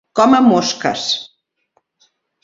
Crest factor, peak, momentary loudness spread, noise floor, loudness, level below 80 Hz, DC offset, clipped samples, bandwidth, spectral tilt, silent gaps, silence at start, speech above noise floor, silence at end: 16 dB; 0 dBFS; 9 LU; -65 dBFS; -14 LUFS; -60 dBFS; under 0.1%; under 0.1%; 7.8 kHz; -4 dB/octave; none; 0.15 s; 51 dB; 1.15 s